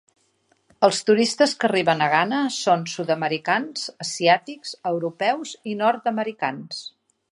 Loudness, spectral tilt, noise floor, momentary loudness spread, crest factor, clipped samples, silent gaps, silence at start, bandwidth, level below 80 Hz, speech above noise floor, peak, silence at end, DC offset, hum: -22 LUFS; -4 dB/octave; -65 dBFS; 11 LU; 20 dB; under 0.1%; none; 0.8 s; 11.5 kHz; -74 dBFS; 43 dB; -2 dBFS; 0.45 s; under 0.1%; none